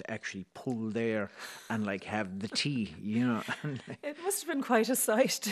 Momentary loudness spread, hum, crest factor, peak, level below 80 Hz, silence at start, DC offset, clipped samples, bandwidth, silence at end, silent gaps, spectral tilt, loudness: 12 LU; none; 20 dB; -12 dBFS; -72 dBFS; 0 s; under 0.1%; under 0.1%; 13.5 kHz; 0 s; none; -4 dB/octave; -33 LUFS